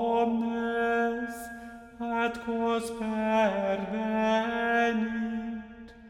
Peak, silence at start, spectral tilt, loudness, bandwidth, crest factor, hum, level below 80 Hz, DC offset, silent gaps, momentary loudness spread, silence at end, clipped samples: -14 dBFS; 0 s; -5.5 dB/octave; -29 LUFS; 14 kHz; 16 dB; none; -58 dBFS; under 0.1%; none; 13 LU; 0 s; under 0.1%